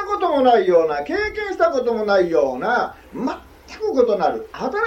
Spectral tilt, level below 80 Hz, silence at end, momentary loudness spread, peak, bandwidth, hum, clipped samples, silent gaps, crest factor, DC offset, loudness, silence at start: -5.5 dB/octave; -48 dBFS; 0 s; 12 LU; -4 dBFS; 8.2 kHz; none; under 0.1%; none; 16 dB; under 0.1%; -19 LUFS; 0 s